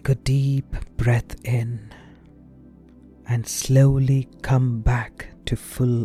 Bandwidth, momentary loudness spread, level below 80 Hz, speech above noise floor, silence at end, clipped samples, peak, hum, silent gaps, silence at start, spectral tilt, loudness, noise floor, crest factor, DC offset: 14.5 kHz; 13 LU; -34 dBFS; 27 dB; 0 s; under 0.1%; -6 dBFS; none; none; 0.05 s; -6.5 dB/octave; -22 LUFS; -48 dBFS; 16 dB; under 0.1%